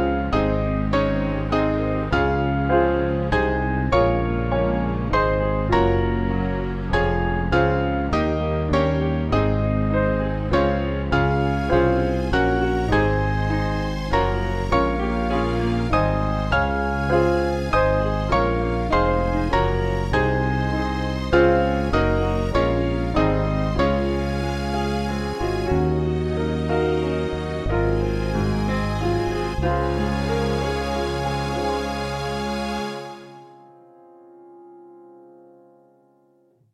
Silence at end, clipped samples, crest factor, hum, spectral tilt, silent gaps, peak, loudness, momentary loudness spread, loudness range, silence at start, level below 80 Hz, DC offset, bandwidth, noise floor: 1.75 s; under 0.1%; 18 dB; none; -7.5 dB/octave; none; -4 dBFS; -22 LUFS; 5 LU; 3 LU; 0 s; -30 dBFS; under 0.1%; 12 kHz; -60 dBFS